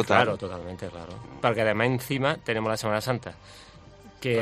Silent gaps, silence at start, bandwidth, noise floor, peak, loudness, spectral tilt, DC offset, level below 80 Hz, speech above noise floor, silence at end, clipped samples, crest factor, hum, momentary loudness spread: none; 0 s; 15.5 kHz; -49 dBFS; -4 dBFS; -27 LUFS; -5.5 dB/octave; under 0.1%; -56 dBFS; 22 dB; 0 s; under 0.1%; 24 dB; none; 18 LU